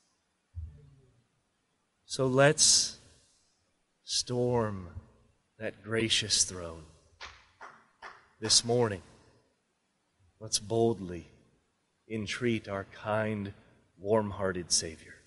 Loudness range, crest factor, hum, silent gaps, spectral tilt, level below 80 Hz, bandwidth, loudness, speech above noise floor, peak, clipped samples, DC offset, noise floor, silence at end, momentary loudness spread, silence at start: 7 LU; 24 dB; none; none; -3 dB/octave; -60 dBFS; 11.5 kHz; -28 LUFS; 47 dB; -8 dBFS; under 0.1%; under 0.1%; -77 dBFS; 0.1 s; 24 LU; 0.55 s